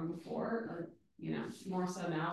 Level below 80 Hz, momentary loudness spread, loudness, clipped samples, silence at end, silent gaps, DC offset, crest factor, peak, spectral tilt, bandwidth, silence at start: -76 dBFS; 9 LU; -41 LUFS; under 0.1%; 0 s; none; under 0.1%; 14 dB; -24 dBFS; -6.5 dB/octave; 12.5 kHz; 0 s